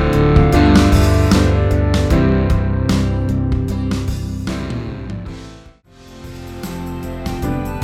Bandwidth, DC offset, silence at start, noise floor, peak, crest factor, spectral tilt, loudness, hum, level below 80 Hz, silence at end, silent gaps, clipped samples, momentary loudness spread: 15.5 kHz; under 0.1%; 0 s; -42 dBFS; 0 dBFS; 16 dB; -7 dB/octave; -16 LUFS; none; -22 dBFS; 0 s; none; under 0.1%; 18 LU